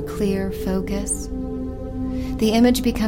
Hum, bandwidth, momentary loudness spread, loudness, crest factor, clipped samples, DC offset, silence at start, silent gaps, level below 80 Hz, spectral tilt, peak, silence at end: none; 17 kHz; 12 LU; -22 LUFS; 18 dB; under 0.1%; 0.2%; 0 s; none; -32 dBFS; -5 dB/octave; -4 dBFS; 0 s